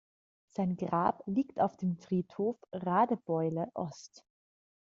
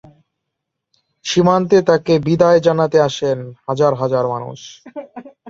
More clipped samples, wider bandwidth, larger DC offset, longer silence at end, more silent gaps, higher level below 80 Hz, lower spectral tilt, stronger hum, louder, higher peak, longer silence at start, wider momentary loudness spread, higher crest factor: neither; about the same, 7.4 kHz vs 7.6 kHz; neither; first, 0.85 s vs 0 s; neither; second, -72 dBFS vs -54 dBFS; first, -8 dB/octave vs -6 dB/octave; neither; second, -33 LUFS vs -15 LUFS; second, -14 dBFS vs 0 dBFS; second, 0.6 s vs 1.25 s; second, 10 LU vs 20 LU; about the same, 20 dB vs 16 dB